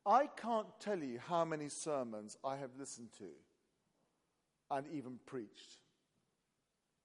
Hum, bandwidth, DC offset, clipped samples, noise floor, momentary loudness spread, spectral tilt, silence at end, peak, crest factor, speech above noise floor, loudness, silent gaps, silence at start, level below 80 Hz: none; 11.5 kHz; under 0.1%; under 0.1%; -86 dBFS; 17 LU; -4.5 dB/octave; 1.3 s; -20 dBFS; 22 dB; 45 dB; -42 LUFS; none; 0.05 s; under -90 dBFS